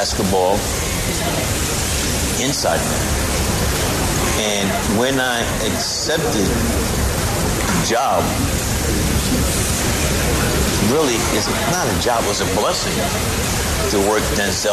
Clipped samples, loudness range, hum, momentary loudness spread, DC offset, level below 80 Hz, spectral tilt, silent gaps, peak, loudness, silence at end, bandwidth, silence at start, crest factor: under 0.1%; 1 LU; none; 2 LU; under 0.1%; -26 dBFS; -3.5 dB/octave; none; -4 dBFS; -18 LUFS; 0 s; 14 kHz; 0 s; 14 dB